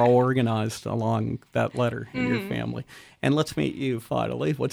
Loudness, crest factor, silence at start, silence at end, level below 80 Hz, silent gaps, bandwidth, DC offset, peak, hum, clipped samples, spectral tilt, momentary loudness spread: -26 LUFS; 16 dB; 0 s; 0 s; -56 dBFS; none; 15 kHz; under 0.1%; -8 dBFS; none; under 0.1%; -6.5 dB/octave; 7 LU